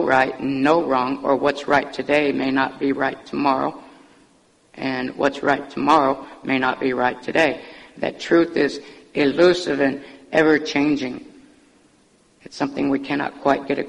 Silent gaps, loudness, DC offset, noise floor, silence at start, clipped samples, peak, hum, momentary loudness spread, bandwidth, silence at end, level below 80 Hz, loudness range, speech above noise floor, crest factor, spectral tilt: none; -20 LUFS; under 0.1%; -57 dBFS; 0 s; under 0.1%; -4 dBFS; none; 11 LU; 10.5 kHz; 0 s; -56 dBFS; 4 LU; 37 dB; 18 dB; -5.5 dB/octave